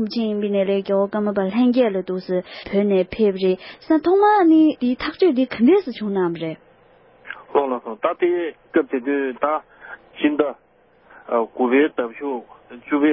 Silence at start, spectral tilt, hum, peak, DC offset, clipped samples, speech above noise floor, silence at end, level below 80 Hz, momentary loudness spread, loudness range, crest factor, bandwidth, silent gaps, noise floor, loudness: 0 s; -11 dB/octave; none; -2 dBFS; under 0.1%; under 0.1%; 34 dB; 0 s; -58 dBFS; 12 LU; 6 LU; 16 dB; 5.8 kHz; none; -53 dBFS; -20 LUFS